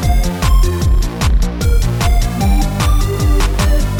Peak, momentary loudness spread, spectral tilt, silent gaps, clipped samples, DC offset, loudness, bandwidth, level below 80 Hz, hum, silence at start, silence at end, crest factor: -2 dBFS; 2 LU; -5.5 dB/octave; none; under 0.1%; under 0.1%; -15 LUFS; 19 kHz; -14 dBFS; none; 0 s; 0 s; 10 dB